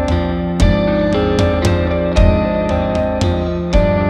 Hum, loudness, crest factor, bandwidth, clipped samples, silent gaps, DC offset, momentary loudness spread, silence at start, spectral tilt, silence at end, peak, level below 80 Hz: none; -15 LUFS; 14 dB; 10.5 kHz; under 0.1%; none; under 0.1%; 4 LU; 0 s; -7 dB/octave; 0 s; 0 dBFS; -20 dBFS